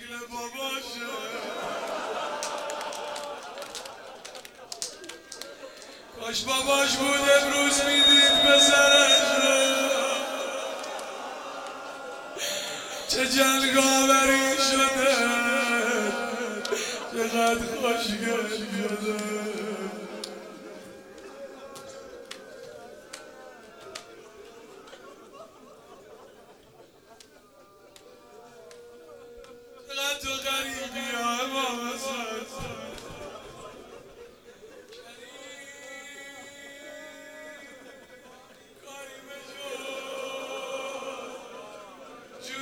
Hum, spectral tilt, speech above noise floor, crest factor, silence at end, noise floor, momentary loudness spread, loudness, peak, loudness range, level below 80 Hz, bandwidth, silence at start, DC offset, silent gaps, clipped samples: none; -1 dB/octave; 33 dB; 22 dB; 0 s; -55 dBFS; 25 LU; -24 LUFS; -6 dBFS; 25 LU; -60 dBFS; 17.5 kHz; 0 s; under 0.1%; none; under 0.1%